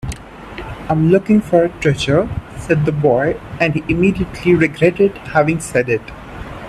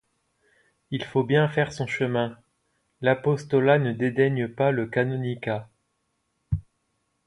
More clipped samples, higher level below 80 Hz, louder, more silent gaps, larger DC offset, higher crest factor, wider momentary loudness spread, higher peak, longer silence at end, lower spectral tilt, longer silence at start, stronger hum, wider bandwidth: neither; first, -36 dBFS vs -50 dBFS; first, -16 LUFS vs -25 LUFS; neither; neither; about the same, 16 dB vs 20 dB; first, 16 LU vs 11 LU; first, 0 dBFS vs -6 dBFS; second, 0 s vs 0.65 s; about the same, -6.5 dB/octave vs -7.5 dB/octave; second, 0.05 s vs 0.9 s; neither; first, 13 kHz vs 11 kHz